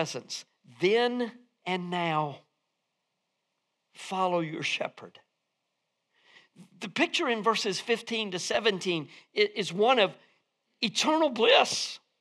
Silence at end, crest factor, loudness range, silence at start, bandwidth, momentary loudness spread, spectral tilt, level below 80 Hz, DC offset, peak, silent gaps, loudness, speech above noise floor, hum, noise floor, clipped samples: 0.25 s; 24 dB; 9 LU; 0 s; 13 kHz; 13 LU; -3.5 dB/octave; -80 dBFS; under 0.1%; -6 dBFS; none; -28 LUFS; 53 dB; none; -81 dBFS; under 0.1%